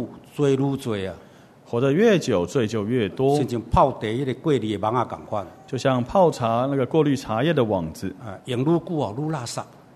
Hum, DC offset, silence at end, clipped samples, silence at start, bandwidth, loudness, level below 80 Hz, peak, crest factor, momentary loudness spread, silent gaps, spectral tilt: none; under 0.1%; 0.3 s; under 0.1%; 0 s; 13.5 kHz; -23 LUFS; -46 dBFS; -4 dBFS; 18 dB; 12 LU; none; -6.5 dB/octave